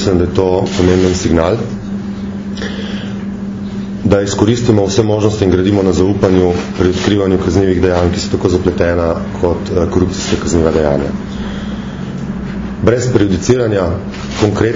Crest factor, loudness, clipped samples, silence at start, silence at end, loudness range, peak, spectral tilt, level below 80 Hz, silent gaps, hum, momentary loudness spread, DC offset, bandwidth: 14 dB; -14 LUFS; 0.2%; 0 s; 0 s; 4 LU; 0 dBFS; -6.5 dB/octave; -30 dBFS; none; none; 10 LU; under 0.1%; 7.6 kHz